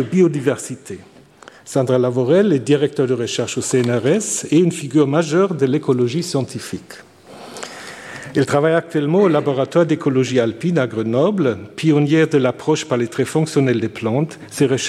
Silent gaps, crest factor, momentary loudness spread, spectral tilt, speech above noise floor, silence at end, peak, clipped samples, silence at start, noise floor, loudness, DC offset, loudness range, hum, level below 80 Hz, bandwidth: none; 14 dB; 14 LU; -6 dB/octave; 27 dB; 0 s; -2 dBFS; under 0.1%; 0 s; -44 dBFS; -17 LUFS; under 0.1%; 4 LU; none; -62 dBFS; 14.5 kHz